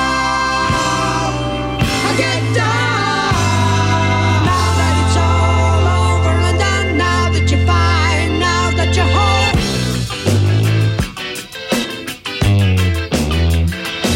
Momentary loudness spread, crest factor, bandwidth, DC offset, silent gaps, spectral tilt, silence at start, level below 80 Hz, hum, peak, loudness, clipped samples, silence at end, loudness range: 6 LU; 10 dB; 16 kHz; under 0.1%; none; -5 dB/octave; 0 s; -26 dBFS; none; -4 dBFS; -15 LUFS; under 0.1%; 0 s; 3 LU